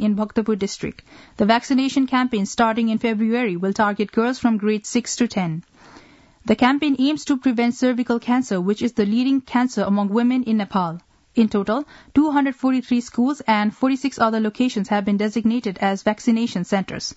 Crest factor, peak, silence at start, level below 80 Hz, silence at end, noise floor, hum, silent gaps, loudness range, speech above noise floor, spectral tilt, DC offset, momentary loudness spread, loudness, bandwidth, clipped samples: 16 dB; -4 dBFS; 0 s; -56 dBFS; 0.05 s; -49 dBFS; none; none; 2 LU; 29 dB; -5.5 dB/octave; under 0.1%; 5 LU; -20 LUFS; 8 kHz; under 0.1%